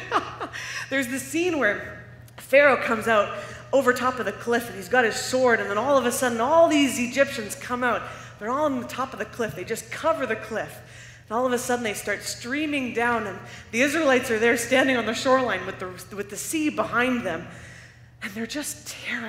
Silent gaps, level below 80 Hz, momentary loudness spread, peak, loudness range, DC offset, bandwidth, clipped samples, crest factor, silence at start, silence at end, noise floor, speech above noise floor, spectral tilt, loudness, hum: none; -58 dBFS; 14 LU; -4 dBFS; 6 LU; under 0.1%; 16 kHz; under 0.1%; 22 dB; 0 s; 0 s; -47 dBFS; 23 dB; -3.5 dB/octave; -24 LUFS; none